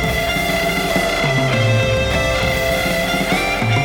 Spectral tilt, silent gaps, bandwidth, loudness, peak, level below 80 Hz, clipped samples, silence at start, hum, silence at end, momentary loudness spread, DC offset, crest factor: -4.5 dB/octave; none; 19 kHz; -17 LUFS; -4 dBFS; -30 dBFS; under 0.1%; 0 s; none; 0 s; 2 LU; under 0.1%; 14 dB